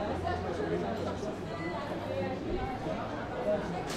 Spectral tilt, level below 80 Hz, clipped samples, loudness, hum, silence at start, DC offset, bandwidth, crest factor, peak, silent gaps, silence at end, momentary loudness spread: -6.5 dB/octave; -48 dBFS; under 0.1%; -35 LUFS; none; 0 s; under 0.1%; 15 kHz; 14 dB; -20 dBFS; none; 0 s; 4 LU